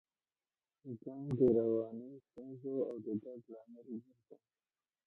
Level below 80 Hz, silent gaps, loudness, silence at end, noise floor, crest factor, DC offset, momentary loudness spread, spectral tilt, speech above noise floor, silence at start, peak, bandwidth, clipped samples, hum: -74 dBFS; none; -37 LUFS; 0.75 s; under -90 dBFS; 20 dB; under 0.1%; 22 LU; -12 dB/octave; over 52 dB; 0.85 s; -20 dBFS; 4.1 kHz; under 0.1%; none